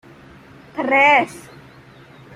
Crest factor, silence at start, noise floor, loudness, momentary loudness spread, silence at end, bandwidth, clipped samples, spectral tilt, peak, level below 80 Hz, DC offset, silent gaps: 20 dB; 0.75 s; -45 dBFS; -15 LUFS; 21 LU; 0.95 s; 15.5 kHz; under 0.1%; -4 dB/octave; 0 dBFS; -60 dBFS; under 0.1%; none